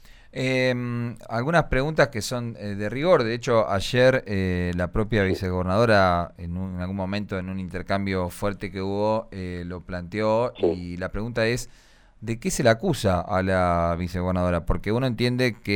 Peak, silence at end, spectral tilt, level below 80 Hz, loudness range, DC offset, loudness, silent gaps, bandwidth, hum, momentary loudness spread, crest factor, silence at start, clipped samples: -6 dBFS; 0 s; -6 dB/octave; -40 dBFS; 5 LU; under 0.1%; -24 LUFS; none; 18 kHz; none; 11 LU; 18 dB; 0.05 s; under 0.1%